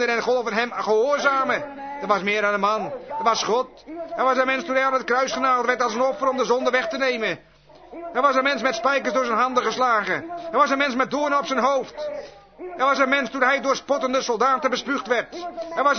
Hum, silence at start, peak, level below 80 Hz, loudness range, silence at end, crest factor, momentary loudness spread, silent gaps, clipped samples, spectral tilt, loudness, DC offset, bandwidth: none; 0 s; -6 dBFS; -62 dBFS; 1 LU; 0 s; 18 dB; 11 LU; none; under 0.1%; -3 dB/octave; -21 LUFS; under 0.1%; 6.6 kHz